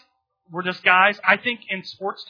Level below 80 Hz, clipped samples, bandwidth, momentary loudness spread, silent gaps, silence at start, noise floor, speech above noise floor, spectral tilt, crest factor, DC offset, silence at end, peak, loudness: -78 dBFS; under 0.1%; 5.4 kHz; 14 LU; none; 0.5 s; -62 dBFS; 41 dB; -5 dB/octave; 22 dB; under 0.1%; 0.05 s; -2 dBFS; -19 LUFS